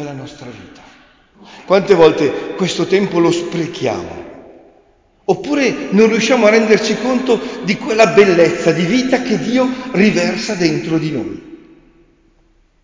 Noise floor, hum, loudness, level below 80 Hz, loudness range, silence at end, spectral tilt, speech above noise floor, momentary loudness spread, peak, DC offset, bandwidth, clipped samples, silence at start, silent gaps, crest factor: -54 dBFS; none; -14 LUFS; -50 dBFS; 6 LU; 1.3 s; -5 dB/octave; 40 dB; 16 LU; 0 dBFS; under 0.1%; 7.6 kHz; under 0.1%; 0 s; none; 16 dB